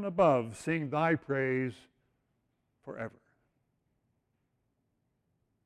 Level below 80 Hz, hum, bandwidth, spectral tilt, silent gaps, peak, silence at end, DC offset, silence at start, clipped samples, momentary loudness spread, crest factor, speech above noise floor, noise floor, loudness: -70 dBFS; none; 12.5 kHz; -7 dB/octave; none; -14 dBFS; 2.55 s; under 0.1%; 0 s; under 0.1%; 16 LU; 22 dB; 48 dB; -79 dBFS; -31 LUFS